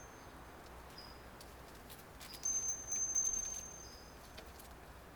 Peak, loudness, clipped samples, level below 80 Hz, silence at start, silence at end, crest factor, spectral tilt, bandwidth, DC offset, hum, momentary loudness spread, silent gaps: -26 dBFS; -37 LUFS; under 0.1%; -60 dBFS; 0 s; 0 s; 18 dB; -1 dB/octave; over 20 kHz; under 0.1%; none; 20 LU; none